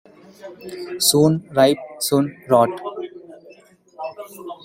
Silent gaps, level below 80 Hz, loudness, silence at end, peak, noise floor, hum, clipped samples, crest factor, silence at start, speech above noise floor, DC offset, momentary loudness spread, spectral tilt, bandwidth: none; -62 dBFS; -18 LUFS; 0.1 s; -2 dBFS; -49 dBFS; none; under 0.1%; 20 dB; 0.45 s; 30 dB; under 0.1%; 19 LU; -4.5 dB/octave; 16.5 kHz